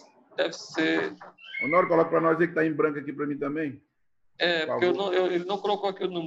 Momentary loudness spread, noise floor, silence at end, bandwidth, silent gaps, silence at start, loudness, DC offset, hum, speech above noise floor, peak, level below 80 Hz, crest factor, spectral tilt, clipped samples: 10 LU; -71 dBFS; 0 s; 7.8 kHz; none; 0.4 s; -26 LUFS; under 0.1%; none; 45 dB; -8 dBFS; -74 dBFS; 18 dB; -5.5 dB/octave; under 0.1%